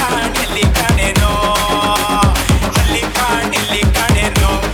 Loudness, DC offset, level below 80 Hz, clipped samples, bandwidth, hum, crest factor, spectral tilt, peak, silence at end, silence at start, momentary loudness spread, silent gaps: -13 LUFS; under 0.1%; -20 dBFS; under 0.1%; 18.5 kHz; none; 14 dB; -4 dB/octave; 0 dBFS; 0 s; 0 s; 2 LU; none